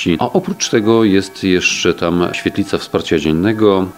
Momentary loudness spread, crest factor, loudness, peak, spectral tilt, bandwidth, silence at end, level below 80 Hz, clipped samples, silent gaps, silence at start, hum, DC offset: 6 LU; 14 dB; -15 LUFS; 0 dBFS; -4.5 dB/octave; 16 kHz; 0.05 s; -42 dBFS; under 0.1%; none; 0 s; none; under 0.1%